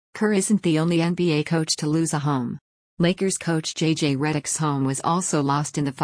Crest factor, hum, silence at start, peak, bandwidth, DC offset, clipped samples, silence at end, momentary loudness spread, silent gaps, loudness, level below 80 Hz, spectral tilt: 14 dB; none; 0.15 s; -8 dBFS; 10.5 kHz; under 0.1%; under 0.1%; 0 s; 4 LU; 2.61-2.97 s; -23 LUFS; -60 dBFS; -5 dB/octave